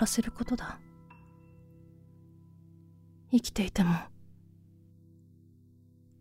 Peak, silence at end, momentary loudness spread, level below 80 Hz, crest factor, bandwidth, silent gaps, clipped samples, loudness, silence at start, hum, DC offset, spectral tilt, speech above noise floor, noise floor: -14 dBFS; 1.95 s; 27 LU; -52 dBFS; 22 dB; 16 kHz; none; under 0.1%; -31 LUFS; 0 s; none; under 0.1%; -5 dB/octave; 30 dB; -59 dBFS